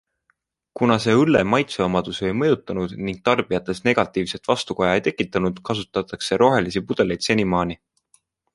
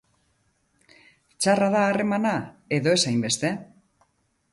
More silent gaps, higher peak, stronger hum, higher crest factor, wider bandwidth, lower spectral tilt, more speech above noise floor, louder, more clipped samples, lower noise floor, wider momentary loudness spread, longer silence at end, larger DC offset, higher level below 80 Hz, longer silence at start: neither; first, -2 dBFS vs -8 dBFS; neither; about the same, 20 dB vs 18 dB; about the same, 11.5 kHz vs 11.5 kHz; first, -5.5 dB/octave vs -4 dB/octave; about the same, 49 dB vs 46 dB; about the same, -21 LUFS vs -23 LUFS; neither; about the same, -69 dBFS vs -69 dBFS; about the same, 9 LU vs 8 LU; about the same, 0.8 s vs 0.9 s; neither; first, -50 dBFS vs -66 dBFS; second, 0.75 s vs 1.4 s